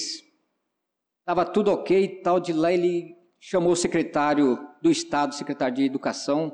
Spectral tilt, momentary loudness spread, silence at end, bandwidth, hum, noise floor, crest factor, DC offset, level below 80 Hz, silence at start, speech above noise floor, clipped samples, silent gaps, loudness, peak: -5 dB/octave; 6 LU; 0 s; 10 kHz; none; -83 dBFS; 12 dB; under 0.1%; -62 dBFS; 0 s; 59 dB; under 0.1%; none; -24 LUFS; -12 dBFS